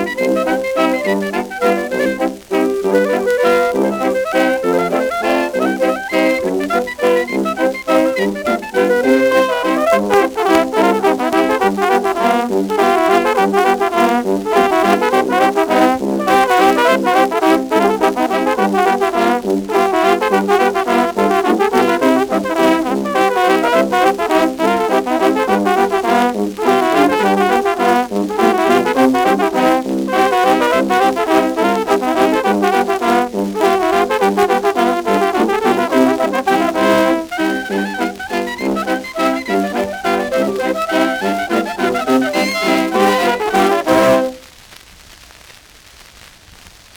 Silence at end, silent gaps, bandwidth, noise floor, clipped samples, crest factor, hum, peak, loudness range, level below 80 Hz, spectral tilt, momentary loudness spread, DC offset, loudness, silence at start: 0.25 s; none; over 20 kHz; -42 dBFS; under 0.1%; 14 dB; none; 0 dBFS; 3 LU; -50 dBFS; -4.5 dB/octave; 5 LU; under 0.1%; -14 LUFS; 0 s